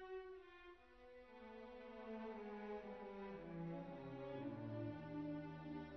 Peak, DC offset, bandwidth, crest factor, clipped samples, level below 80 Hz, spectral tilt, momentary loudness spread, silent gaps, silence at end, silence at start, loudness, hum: -38 dBFS; under 0.1%; 6.2 kHz; 14 dB; under 0.1%; -74 dBFS; -6.5 dB/octave; 13 LU; none; 0 s; 0 s; -52 LUFS; none